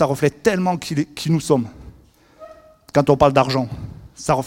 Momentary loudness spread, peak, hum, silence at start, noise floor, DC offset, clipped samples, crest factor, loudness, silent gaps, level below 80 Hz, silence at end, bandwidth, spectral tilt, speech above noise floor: 14 LU; 0 dBFS; none; 0 s; -50 dBFS; under 0.1%; under 0.1%; 20 dB; -19 LUFS; none; -46 dBFS; 0 s; 17 kHz; -6 dB/octave; 32 dB